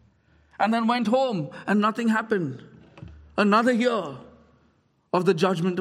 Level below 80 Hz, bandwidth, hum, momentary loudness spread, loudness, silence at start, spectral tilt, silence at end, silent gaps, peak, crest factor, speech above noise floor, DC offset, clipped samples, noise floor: -60 dBFS; 12 kHz; none; 13 LU; -24 LUFS; 0.6 s; -6.5 dB/octave; 0 s; none; -6 dBFS; 18 dB; 42 dB; under 0.1%; under 0.1%; -65 dBFS